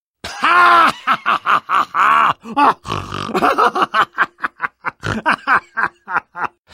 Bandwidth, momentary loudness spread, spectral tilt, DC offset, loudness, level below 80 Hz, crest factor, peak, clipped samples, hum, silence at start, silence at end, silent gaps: 16 kHz; 13 LU; -4 dB/octave; under 0.1%; -15 LUFS; -50 dBFS; 16 dB; 0 dBFS; under 0.1%; none; 0.25 s; 0.25 s; none